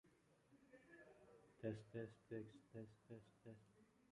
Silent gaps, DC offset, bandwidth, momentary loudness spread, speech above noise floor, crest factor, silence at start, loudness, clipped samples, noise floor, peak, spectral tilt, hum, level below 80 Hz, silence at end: none; under 0.1%; 11 kHz; 15 LU; 21 dB; 24 dB; 0.05 s; -57 LUFS; under 0.1%; -77 dBFS; -36 dBFS; -8 dB/octave; none; -84 dBFS; 0.1 s